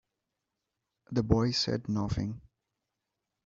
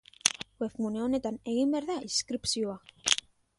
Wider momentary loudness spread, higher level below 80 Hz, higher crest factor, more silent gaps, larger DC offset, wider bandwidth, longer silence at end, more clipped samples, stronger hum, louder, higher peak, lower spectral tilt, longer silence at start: first, 10 LU vs 6 LU; first, -50 dBFS vs -64 dBFS; about the same, 26 dB vs 30 dB; neither; neither; second, 7.6 kHz vs 11.5 kHz; first, 1.05 s vs 0.4 s; neither; neither; about the same, -31 LUFS vs -31 LUFS; second, -8 dBFS vs 0 dBFS; first, -6 dB/octave vs -2 dB/octave; first, 1.1 s vs 0.25 s